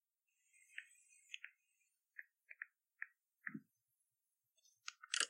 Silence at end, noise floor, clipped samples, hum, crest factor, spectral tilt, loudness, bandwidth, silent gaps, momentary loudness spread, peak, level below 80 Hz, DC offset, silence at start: 0 s; under -90 dBFS; under 0.1%; none; 34 dB; 0.5 dB/octave; -54 LUFS; 16 kHz; none; 7 LU; -20 dBFS; under -90 dBFS; under 0.1%; 0.7 s